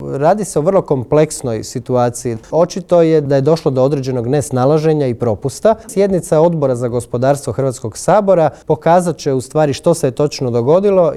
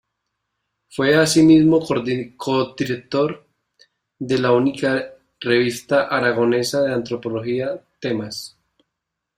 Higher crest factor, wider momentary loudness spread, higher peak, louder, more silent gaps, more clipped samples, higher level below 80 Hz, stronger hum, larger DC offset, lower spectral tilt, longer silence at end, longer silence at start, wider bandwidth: second, 12 dB vs 18 dB; second, 7 LU vs 16 LU; about the same, 0 dBFS vs -2 dBFS; first, -14 LUFS vs -19 LUFS; neither; neither; first, -46 dBFS vs -56 dBFS; neither; neither; first, -6.5 dB/octave vs -5 dB/octave; second, 0 s vs 0.9 s; second, 0 s vs 0.95 s; second, 14 kHz vs 16 kHz